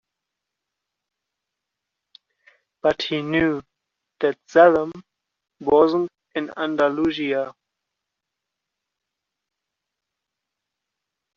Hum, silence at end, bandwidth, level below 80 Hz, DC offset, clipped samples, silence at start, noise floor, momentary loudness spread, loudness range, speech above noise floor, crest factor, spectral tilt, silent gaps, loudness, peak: none; 3.85 s; 7.2 kHz; -60 dBFS; under 0.1%; under 0.1%; 2.85 s; -83 dBFS; 15 LU; 10 LU; 64 dB; 22 dB; -3.5 dB/octave; none; -21 LUFS; -4 dBFS